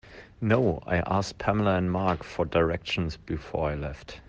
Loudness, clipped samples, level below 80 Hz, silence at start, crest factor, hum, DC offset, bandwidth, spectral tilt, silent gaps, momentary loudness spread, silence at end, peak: -28 LUFS; under 0.1%; -46 dBFS; 0.05 s; 18 dB; none; under 0.1%; 8.8 kHz; -6.5 dB/octave; none; 9 LU; 0.1 s; -10 dBFS